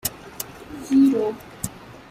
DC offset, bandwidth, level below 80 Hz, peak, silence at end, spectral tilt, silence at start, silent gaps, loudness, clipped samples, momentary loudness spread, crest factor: under 0.1%; 16 kHz; -52 dBFS; -6 dBFS; 0.2 s; -5 dB/octave; 0.05 s; none; -22 LUFS; under 0.1%; 18 LU; 16 dB